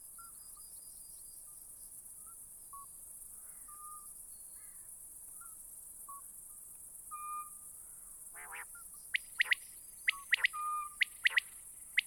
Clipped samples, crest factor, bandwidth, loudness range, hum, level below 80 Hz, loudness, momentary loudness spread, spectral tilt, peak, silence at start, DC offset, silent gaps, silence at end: under 0.1%; 24 dB; 17.5 kHz; 14 LU; none; -72 dBFS; -40 LUFS; 17 LU; 2.5 dB/octave; -18 dBFS; 0 s; under 0.1%; none; 0 s